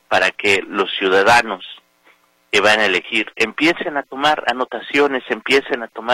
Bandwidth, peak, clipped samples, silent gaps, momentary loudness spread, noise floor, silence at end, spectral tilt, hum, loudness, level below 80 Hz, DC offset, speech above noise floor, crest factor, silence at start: 16.5 kHz; 0 dBFS; under 0.1%; none; 11 LU; -55 dBFS; 0 s; -3 dB/octave; none; -16 LUFS; -54 dBFS; under 0.1%; 38 dB; 18 dB; 0.1 s